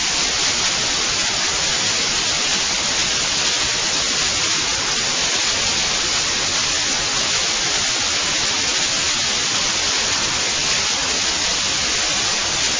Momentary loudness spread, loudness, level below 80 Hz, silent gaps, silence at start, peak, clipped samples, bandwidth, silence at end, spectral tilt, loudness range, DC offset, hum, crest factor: 1 LU; -16 LUFS; -42 dBFS; none; 0 s; -6 dBFS; under 0.1%; 7.8 kHz; 0 s; 0 dB/octave; 0 LU; under 0.1%; none; 14 dB